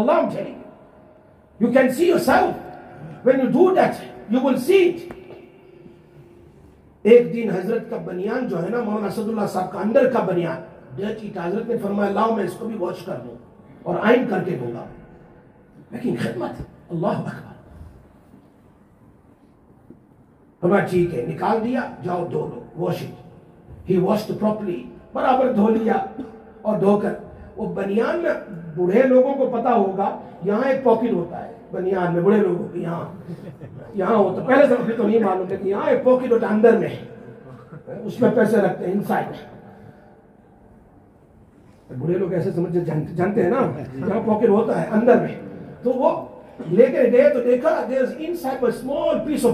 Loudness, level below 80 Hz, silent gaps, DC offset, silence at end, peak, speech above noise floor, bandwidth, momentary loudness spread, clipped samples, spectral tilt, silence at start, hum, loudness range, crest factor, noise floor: -20 LUFS; -56 dBFS; none; under 0.1%; 0 s; 0 dBFS; 33 dB; 14.5 kHz; 18 LU; under 0.1%; -7.5 dB/octave; 0 s; none; 9 LU; 20 dB; -52 dBFS